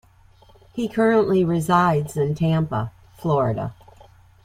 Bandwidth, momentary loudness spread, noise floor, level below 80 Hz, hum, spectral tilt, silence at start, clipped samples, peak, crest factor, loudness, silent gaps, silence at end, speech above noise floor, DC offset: 15 kHz; 12 LU; -52 dBFS; -50 dBFS; none; -7.5 dB/octave; 0.75 s; under 0.1%; -4 dBFS; 18 dB; -21 LUFS; none; 0.7 s; 32 dB; under 0.1%